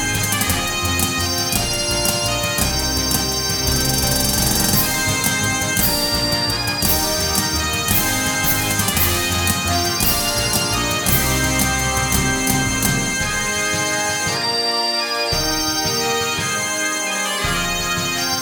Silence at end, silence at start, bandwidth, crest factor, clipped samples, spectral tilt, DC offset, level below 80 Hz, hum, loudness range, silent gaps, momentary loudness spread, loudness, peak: 0 s; 0 s; 18 kHz; 16 dB; under 0.1%; -2.5 dB/octave; under 0.1%; -32 dBFS; none; 2 LU; none; 3 LU; -17 LUFS; -2 dBFS